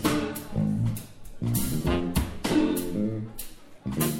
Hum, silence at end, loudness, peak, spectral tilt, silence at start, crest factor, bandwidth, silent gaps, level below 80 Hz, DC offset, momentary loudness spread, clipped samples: none; 0 s; -28 LUFS; -10 dBFS; -5.5 dB/octave; 0 s; 16 dB; 17 kHz; none; -40 dBFS; under 0.1%; 14 LU; under 0.1%